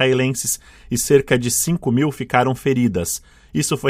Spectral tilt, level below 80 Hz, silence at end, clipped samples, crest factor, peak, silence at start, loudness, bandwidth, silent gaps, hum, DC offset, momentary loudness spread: -4.5 dB/octave; -46 dBFS; 0 s; under 0.1%; 18 dB; 0 dBFS; 0 s; -19 LUFS; 16 kHz; none; none; under 0.1%; 9 LU